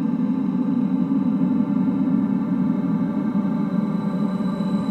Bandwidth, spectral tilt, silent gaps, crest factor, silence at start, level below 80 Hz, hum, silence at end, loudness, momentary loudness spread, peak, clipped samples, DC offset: 4.3 kHz; -10 dB/octave; none; 12 dB; 0 s; -58 dBFS; none; 0 s; -22 LUFS; 3 LU; -8 dBFS; under 0.1%; under 0.1%